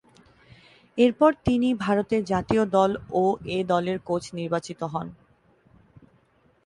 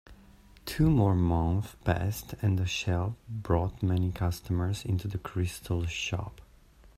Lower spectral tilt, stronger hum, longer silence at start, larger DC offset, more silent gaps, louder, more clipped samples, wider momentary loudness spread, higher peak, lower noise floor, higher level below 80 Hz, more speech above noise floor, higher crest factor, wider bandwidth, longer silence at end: about the same, -6.5 dB/octave vs -6.5 dB/octave; neither; first, 0.95 s vs 0.1 s; neither; neither; first, -24 LUFS vs -30 LUFS; neither; about the same, 11 LU vs 9 LU; first, -6 dBFS vs -10 dBFS; first, -63 dBFS vs -56 dBFS; second, -52 dBFS vs -46 dBFS; first, 39 dB vs 28 dB; about the same, 20 dB vs 18 dB; second, 11 kHz vs 14.5 kHz; first, 1.5 s vs 0.55 s